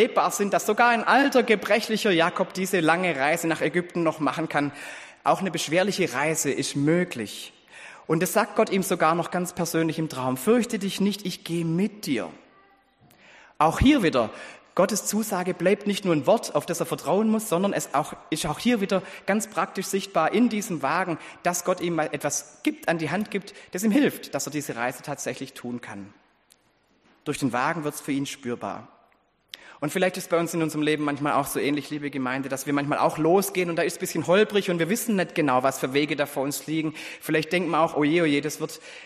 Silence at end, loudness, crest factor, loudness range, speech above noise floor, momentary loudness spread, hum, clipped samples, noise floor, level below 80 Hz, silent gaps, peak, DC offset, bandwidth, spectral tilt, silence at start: 0 s; -25 LUFS; 20 dB; 6 LU; 40 dB; 10 LU; none; under 0.1%; -65 dBFS; -52 dBFS; none; -6 dBFS; under 0.1%; 15 kHz; -4.5 dB/octave; 0 s